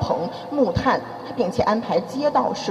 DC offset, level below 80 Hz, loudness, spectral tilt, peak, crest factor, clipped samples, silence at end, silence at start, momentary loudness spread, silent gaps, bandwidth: under 0.1%; -46 dBFS; -22 LUFS; -6 dB/octave; -6 dBFS; 16 dB; under 0.1%; 0 s; 0 s; 6 LU; none; 13.5 kHz